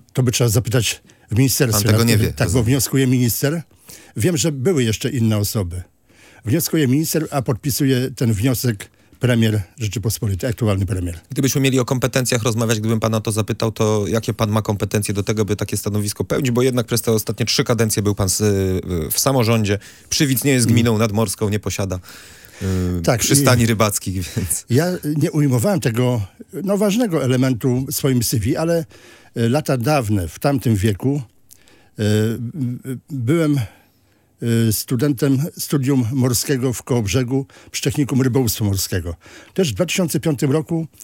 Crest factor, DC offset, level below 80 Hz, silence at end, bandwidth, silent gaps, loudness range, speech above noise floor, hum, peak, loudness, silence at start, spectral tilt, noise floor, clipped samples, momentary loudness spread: 18 dB; under 0.1%; -48 dBFS; 0 s; 17 kHz; none; 3 LU; 40 dB; none; 0 dBFS; -19 LUFS; 0.15 s; -5 dB/octave; -58 dBFS; under 0.1%; 8 LU